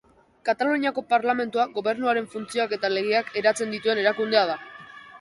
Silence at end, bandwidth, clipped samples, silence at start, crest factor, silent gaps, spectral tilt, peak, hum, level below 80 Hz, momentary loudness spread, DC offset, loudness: 0 s; 11.5 kHz; under 0.1%; 0.45 s; 18 dB; none; -3.5 dB/octave; -6 dBFS; none; -70 dBFS; 8 LU; under 0.1%; -24 LUFS